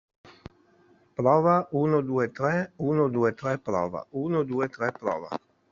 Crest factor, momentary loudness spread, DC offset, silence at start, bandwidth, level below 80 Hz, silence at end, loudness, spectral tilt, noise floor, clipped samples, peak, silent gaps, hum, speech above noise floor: 20 dB; 10 LU; under 0.1%; 0.25 s; 7.4 kHz; -64 dBFS; 0.35 s; -26 LUFS; -7.5 dB/octave; -61 dBFS; under 0.1%; -8 dBFS; none; none; 35 dB